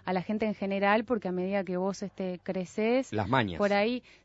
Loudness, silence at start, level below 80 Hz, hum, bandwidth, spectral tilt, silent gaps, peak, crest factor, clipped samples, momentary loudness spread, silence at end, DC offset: -30 LUFS; 0.05 s; -62 dBFS; none; 8 kHz; -6.5 dB/octave; none; -10 dBFS; 20 dB; under 0.1%; 8 LU; 0.25 s; under 0.1%